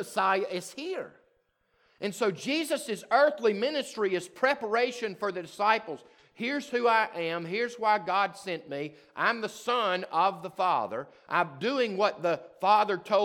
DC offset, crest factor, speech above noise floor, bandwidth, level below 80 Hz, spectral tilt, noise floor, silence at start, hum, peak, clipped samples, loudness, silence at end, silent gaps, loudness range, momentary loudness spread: under 0.1%; 20 dB; 43 dB; 18 kHz; -82 dBFS; -4 dB/octave; -72 dBFS; 0 s; none; -10 dBFS; under 0.1%; -29 LUFS; 0 s; none; 2 LU; 11 LU